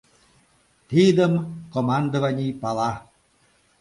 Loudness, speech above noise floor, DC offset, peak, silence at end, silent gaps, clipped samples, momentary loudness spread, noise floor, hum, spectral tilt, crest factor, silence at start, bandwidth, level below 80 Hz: -22 LUFS; 41 dB; under 0.1%; -6 dBFS; 0.8 s; none; under 0.1%; 10 LU; -62 dBFS; none; -7 dB/octave; 18 dB; 0.9 s; 11.5 kHz; -58 dBFS